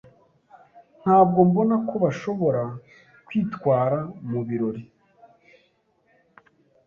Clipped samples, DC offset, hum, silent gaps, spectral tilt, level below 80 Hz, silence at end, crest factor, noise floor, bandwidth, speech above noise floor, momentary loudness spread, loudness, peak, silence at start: under 0.1%; under 0.1%; none; none; -9.5 dB/octave; -62 dBFS; 2.05 s; 20 dB; -65 dBFS; 7 kHz; 44 dB; 13 LU; -23 LUFS; -4 dBFS; 0.75 s